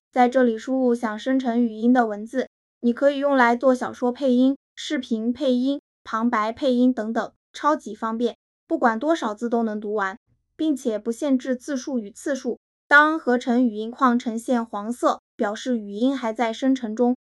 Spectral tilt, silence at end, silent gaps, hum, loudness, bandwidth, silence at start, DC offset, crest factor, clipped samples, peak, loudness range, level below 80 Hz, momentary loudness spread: -4.5 dB/octave; 0.1 s; 2.47-2.81 s, 4.56-4.76 s, 5.79-6.05 s, 7.36-7.54 s, 8.35-8.67 s, 10.17-10.26 s, 12.57-12.90 s, 15.19-15.38 s; none; -23 LUFS; 12 kHz; 0.15 s; under 0.1%; 20 dB; under 0.1%; -2 dBFS; 4 LU; -70 dBFS; 10 LU